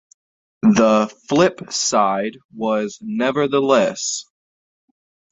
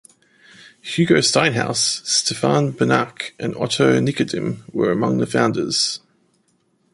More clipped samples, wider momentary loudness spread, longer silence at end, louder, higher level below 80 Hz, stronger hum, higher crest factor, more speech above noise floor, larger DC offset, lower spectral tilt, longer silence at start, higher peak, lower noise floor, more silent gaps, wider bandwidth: neither; about the same, 10 LU vs 10 LU; first, 1.1 s vs 0.95 s; about the same, -18 LUFS vs -19 LUFS; about the same, -58 dBFS vs -56 dBFS; neither; about the same, 18 dB vs 18 dB; first, over 72 dB vs 45 dB; neither; about the same, -4 dB/octave vs -4 dB/octave; about the same, 0.65 s vs 0.65 s; about the same, -2 dBFS vs -2 dBFS; first, under -90 dBFS vs -64 dBFS; first, 2.45-2.49 s vs none; second, 8 kHz vs 11.5 kHz